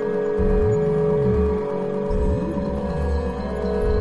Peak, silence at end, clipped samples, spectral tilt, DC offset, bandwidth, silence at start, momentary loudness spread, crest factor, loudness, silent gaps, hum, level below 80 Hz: -10 dBFS; 0 s; under 0.1%; -9 dB/octave; 0.9%; 11 kHz; 0 s; 6 LU; 12 dB; -22 LUFS; none; none; -28 dBFS